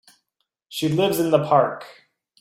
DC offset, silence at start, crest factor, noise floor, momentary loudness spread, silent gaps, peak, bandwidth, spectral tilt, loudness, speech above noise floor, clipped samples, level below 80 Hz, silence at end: under 0.1%; 0.7 s; 18 dB; -77 dBFS; 14 LU; none; -4 dBFS; 16.5 kHz; -5.5 dB/octave; -20 LUFS; 57 dB; under 0.1%; -62 dBFS; 0.5 s